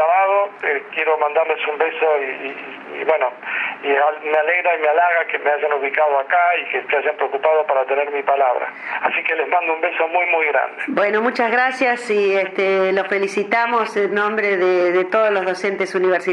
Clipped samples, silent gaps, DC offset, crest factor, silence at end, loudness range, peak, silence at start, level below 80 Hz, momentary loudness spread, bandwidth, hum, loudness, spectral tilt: under 0.1%; none; under 0.1%; 16 dB; 0 s; 2 LU; -2 dBFS; 0 s; -82 dBFS; 5 LU; 11.5 kHz; none; -18 LUFS; -4.5 dB/octave